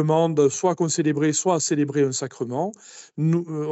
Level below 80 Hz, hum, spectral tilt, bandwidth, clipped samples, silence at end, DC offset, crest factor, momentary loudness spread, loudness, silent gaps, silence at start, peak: -70 dBFS; none; -5.5 dB/octave; 8.6 kHz; under 0.1%; 0 s; under 0.1%; 14 dB; 9 LU; -22 LUFS; none; 0 s; -8 dBFS